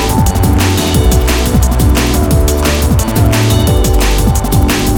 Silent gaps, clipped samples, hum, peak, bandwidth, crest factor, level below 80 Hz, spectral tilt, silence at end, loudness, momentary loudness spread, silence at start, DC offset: none; under 0.1%; none; 0 dBFS; 19 kHz; 10 dB; -14 dBFS; -5 dB/octave; 0 s; -11 LUFS; 1 LU; 0 s; under 0.1%